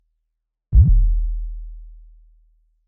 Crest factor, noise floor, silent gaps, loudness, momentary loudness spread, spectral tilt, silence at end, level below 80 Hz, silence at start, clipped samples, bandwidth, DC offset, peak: 16 dB; -77 dBFS; none; -19 LUFS; 22 LU; -16.5 dB/octave; 0.95 s; -20 dBFS; 0.7 s; under 0.1%; 0.7 kHz; under 0.1%; -2 dBFS